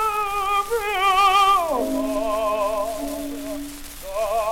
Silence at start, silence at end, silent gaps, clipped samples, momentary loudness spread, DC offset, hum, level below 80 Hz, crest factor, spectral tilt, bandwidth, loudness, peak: 0 s; 0 s; none; under 0.1%; 15 LU; under 0.1%; none; -42 dBFS; 14 dB; -2.5 dB/octave; 17.5 kHz; -21 LUFS; -8 dBFS